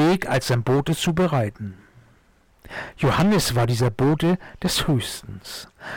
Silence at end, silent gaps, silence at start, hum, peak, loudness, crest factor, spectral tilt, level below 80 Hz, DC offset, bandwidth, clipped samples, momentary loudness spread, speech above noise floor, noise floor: 0 s; none; 0 s; none; -14 dBFS; -21 LUFS; 8 dB; -5.5 dB/octave; -44 dBFS; under 0.1%; 18.5 kHz; under 0.1%; 16 LU; 36 dB; -58 dBFS